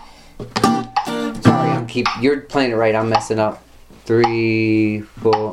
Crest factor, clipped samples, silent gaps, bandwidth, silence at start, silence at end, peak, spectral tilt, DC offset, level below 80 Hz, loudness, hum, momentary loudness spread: 18 dB; under 0.1%; none; 14 kHz; 0 s; 0 s; 0 dBFS; -6 dB/octave; under 0.1%; -46 dBFS; -18 LUFS; none; 7 LU